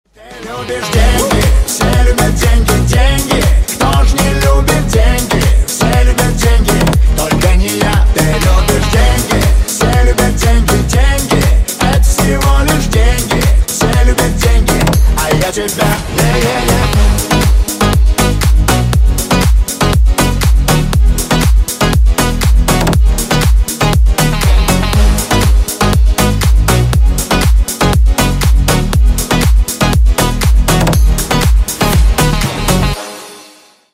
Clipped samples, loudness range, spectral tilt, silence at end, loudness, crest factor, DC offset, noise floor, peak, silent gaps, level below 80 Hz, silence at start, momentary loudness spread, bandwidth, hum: under 0.1%; 1 LU; -4.5 dB/octave; 0.5 s; -11 LUFS; 10 dB; under 0.1%; -41 dBFS; 0 dBFS; none; -12 dBFS; 0.25 s; 2 LU; 16.5 kHz; none